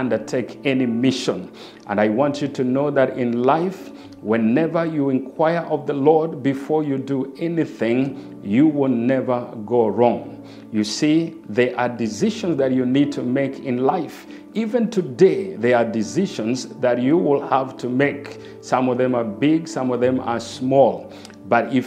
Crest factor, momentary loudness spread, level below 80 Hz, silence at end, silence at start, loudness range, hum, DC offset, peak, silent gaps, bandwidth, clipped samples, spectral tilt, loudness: 18 dB; 9 LU; -64 dBFS; 0 s; 0 s; 1 LU; none; under 0.1%; -2 dBFS; none; 11 kHz; under 0.1%; -6.5 dB/octave; -20 LUFS